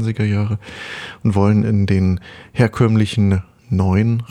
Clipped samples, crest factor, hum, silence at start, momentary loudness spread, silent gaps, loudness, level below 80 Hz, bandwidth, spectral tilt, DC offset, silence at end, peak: under 0.1%; 14 dB; none; 0 s; 11 LU; none; -17 LUFS; -44 dBFS; 11 kHz; -8 dB/octave; under 0.1%; 0.05 s; -2 dBFS